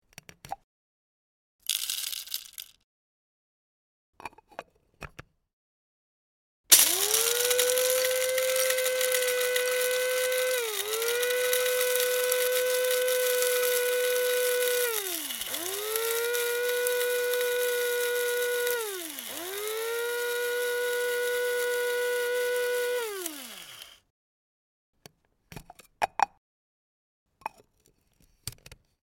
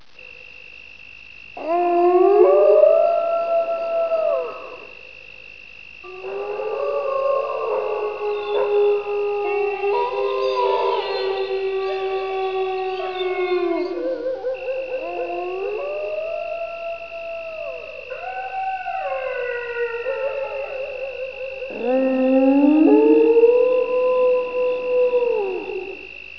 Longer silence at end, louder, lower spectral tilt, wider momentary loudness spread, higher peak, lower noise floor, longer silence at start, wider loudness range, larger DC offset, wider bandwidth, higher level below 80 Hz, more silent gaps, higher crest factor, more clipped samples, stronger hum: first, 0.3 s vs 0 s; second, -26 LUFS vs -20 LUFS; second, 1 dB/octave vs -6 dB/octave; about the same, 19 LU vs 20 LU; about the same, 0 dBFS vs -2 dBFS; first, -68 dBFS vs -42 dBFS; first, 0.45 s vs 0.2 s; first, 14 LU vs 11 LU; second, under 0.1% vs 0.4%; first, 17 kHz vs 5.4 kHz; second, -68 dBFS vs -58 dBFS; first, 0.64-1.59 s, 2.84-4.13 s, 5.53-6.64 s, 24.10-24.93 s, 26.37-27.26 s vs none; first, 30 dB vs 18 dB; neither; neither